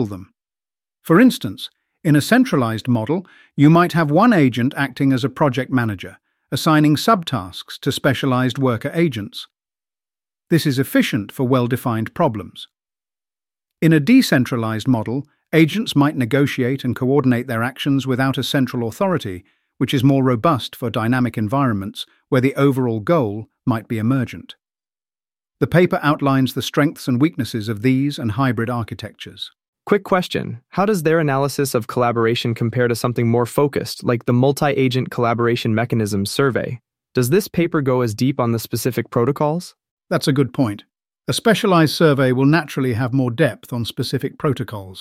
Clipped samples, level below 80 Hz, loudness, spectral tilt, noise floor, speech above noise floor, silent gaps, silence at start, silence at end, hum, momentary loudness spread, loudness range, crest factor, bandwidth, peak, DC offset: under 0.1%; -56 dBFS; -18 LUFS; -6.5 dB/octave; under -90 dBFS; over 72 dB; 29.68-29.73 s, 39.91-39.97 s; 0 s; 0 s; none; 11 LU; 4 LU; 18 dB; 16 kHz; -2 dBFS; under 0.1%